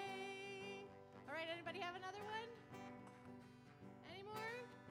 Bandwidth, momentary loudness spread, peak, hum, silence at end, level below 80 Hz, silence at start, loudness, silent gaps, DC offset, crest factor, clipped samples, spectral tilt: 16 kHz; 12 LU; -34 dBFS; none; 0 s; -84 dBFS; 0 s; -52 LUFS; none; under 0.1%; 18 dB; under 0.1%; -4.5 dB/octave